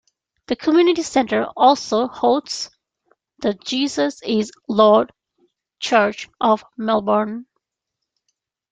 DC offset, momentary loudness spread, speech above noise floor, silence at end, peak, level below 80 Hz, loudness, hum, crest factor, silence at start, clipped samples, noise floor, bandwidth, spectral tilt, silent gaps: under 0.1%; 12 LU; 63 dB; 1.3 s; -2 dBFS; -62 dBFS; -19 LUFS; none; 18 dB; 0.5 s; under 0.1%; -81 dBFS; 9.4 kHz; -4 dB/octave; none